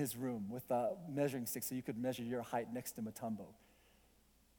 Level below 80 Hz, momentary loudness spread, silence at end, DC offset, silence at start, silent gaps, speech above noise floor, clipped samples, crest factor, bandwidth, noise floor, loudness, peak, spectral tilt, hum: -74 dBFS; 7 LU; 1.05 s; under 0.1%; 0 s; none; 29 dB; under 0.1%; 18 dB; 19.5 kHz; -71 dBFS; -42 LUFS; -26 dBFS; -5.5 dB/octave; none